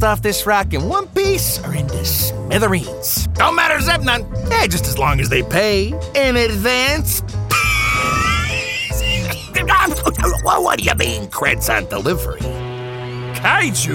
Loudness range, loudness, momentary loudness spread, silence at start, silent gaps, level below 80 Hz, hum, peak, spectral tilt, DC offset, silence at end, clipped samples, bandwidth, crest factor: 2 LU; -16 LUFS; 6 LU; 0 s; none; -28 dBFS; none; 0 dBFS; -3.5 dB/octave; under 0.1%; 0 s; under 0.1%; 18.5 kHz; 16 dB